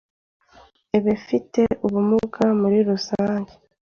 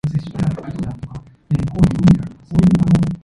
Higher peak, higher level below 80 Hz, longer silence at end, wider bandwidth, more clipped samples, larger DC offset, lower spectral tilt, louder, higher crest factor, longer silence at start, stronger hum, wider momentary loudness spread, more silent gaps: second, -6 dBFS vs 0 dBFS; second, -54 dBFS vs -34 dBFS; first, 0.5 s vs 0.1 s; second, 7 kHz vs 11 kHz; neither; neither; second, -7 dB/octave vs -8.5 dB/octave; second, -21 LUFS vs -17 LUFS; about the same, 16 dB vs 16 dB; first, 0.95 s vs 0.05 s; neither; second, 6 LU vs 15 LU; neither